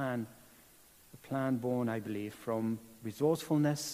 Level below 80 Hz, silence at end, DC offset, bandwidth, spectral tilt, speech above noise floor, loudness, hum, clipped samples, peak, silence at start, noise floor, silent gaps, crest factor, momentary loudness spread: -72 dBFS; 0 s; under 0.1%; 15.5 kHz; -6 dB/octave; 27 dB; -35 LUFS; none; under 0.1%; -18 dBFS; 0 s; -61 dBFS; none; 16 dB; 11 LU